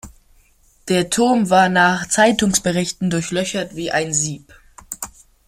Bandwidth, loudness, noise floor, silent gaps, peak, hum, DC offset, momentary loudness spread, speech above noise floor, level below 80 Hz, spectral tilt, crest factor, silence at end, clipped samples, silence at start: 16 kHz; -17 LUFS; -54 dBFS; none; -2 dBFS; none; under 0.1%; 16 LU; 37 dB; -48 dBFS; -3.5 dB/octave; 18 dB; 0.4 s; under 0.1%; 0.05 s